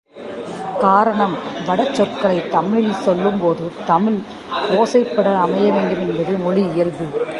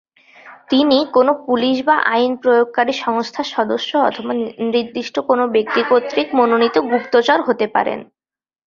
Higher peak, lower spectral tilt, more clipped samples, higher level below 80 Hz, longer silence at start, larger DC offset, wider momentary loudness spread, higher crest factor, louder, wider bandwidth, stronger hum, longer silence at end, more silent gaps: about the same, -2 dBFS vs 0 dBFS; first, -6.5 dB/octave vs -4.5 dB/octave; neither; first, -56 dBFS vs -62 dBFS; second, 0.15 s vs 0.45 s; neither; about the same, 9 LU vs 7 LU; about the same, 16 dB vs 16 dB; about the same, -17 LUFS vs -16 LUFS; first, 11.5 kHz vs 7.2 kHz; neither; second, 0 s vs 0.65 s; neither